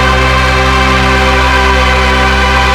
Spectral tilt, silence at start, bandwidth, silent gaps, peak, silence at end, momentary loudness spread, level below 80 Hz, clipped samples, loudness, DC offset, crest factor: -4.5 dB/octave; 0 s; 14 kHz; none; 0 dBFS; 0 s; 0 LU; -14 dBFS; 0.5%; -8 LUFS; under 0.1%; 8 dB